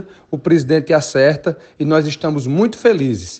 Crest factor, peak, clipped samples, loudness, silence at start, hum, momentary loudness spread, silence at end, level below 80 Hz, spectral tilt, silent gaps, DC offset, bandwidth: 16 dB; 0 dBFS; under 0.1%; -16 LUFS; 0 s; none; 9 LU; 0 s; -54 dBFS; -6 dB/octave; none; under 0.1%; 8.8 kHz